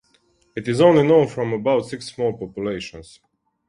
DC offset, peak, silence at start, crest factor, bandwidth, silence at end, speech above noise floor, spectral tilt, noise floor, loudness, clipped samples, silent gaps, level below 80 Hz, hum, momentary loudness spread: under 0.1%; -2 dBFS; 0.55 s; 20 dB; 11 kHz; 0.65 s; 42 dB; -6.5 dB/octave; -61 dBFS; -19 LUFS; under 0.1%; none; -54 dBFS; none; 16 LU